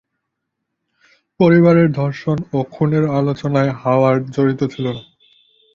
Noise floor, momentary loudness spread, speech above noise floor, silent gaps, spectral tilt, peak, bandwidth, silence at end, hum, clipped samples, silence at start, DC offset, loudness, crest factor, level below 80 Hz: -76 dBFS; 11 LU; 61 dB; none; -9 dB/octave; -2 dBFS; 7.2 kHz; 0.75 s; none; under 0.1%; 1.4 s; under 0.1%; -16 LUFS; 16 dB; -52 dBFS